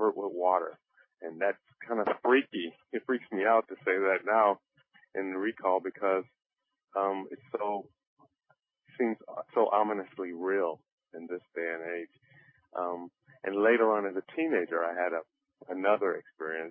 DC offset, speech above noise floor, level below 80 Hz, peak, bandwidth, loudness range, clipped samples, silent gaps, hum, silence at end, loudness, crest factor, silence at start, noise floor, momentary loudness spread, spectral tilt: under 0.1%; 43 dB; -82 dBFS; -12 dBFS; 3.7 kHz; 7 LU; under 0.1%; 6.46-6.50 s, 8.07-8.17 s, 10.92-10.98 s; none; 0 s; -31 LUFS; 20 dB; 0 s; -74 dBFS; 15 LU; -2.5 dB/octave